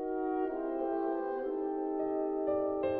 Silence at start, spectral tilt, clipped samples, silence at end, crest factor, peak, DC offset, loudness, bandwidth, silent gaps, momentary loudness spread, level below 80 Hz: 0 s; -6 dB/octave; under 0.1%; 0 s; 12 dB; -22 dBFS; under 0.1%; -34 LUFS; 4 kHz; none; 3 LU; -64 dBFS